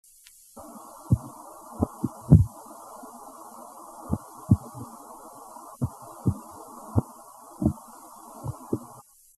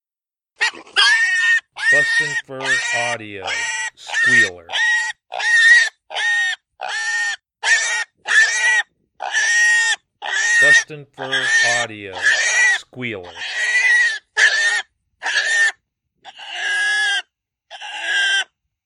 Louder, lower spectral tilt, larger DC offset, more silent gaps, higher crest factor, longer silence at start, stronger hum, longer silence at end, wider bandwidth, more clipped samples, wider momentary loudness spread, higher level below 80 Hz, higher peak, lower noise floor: second, -28 LUFS vs -16 LUFS; first, -9 dB/octave vs 0.5 dB/octave; neither; neither; first, 28 dB vs 18 dB; about the same, 0.55 s vs 0.6 s; neither; first, 0.55 s vs 0.4 s; first, 13 kHz vs 11.5 kHz; neither; first, 20 LU vs 13 LU; first, -42 dBFS vs -72 dBFS; about the same, -2 dBFS vs 0 dBFS; second, -54 dBFS vs under -90 dBFS